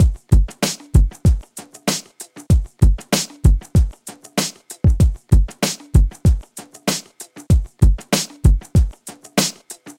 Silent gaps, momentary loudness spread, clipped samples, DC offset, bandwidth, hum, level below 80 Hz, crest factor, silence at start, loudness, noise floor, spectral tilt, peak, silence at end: none; 10 LU; under 0.1%; under 0.1%; 16.5 kHz; none; -20 dBFS; 16 dB; 0 s; -19 LUFS; -40 dBFS; -5 dB/octave; 0 dBFS; 0.05 s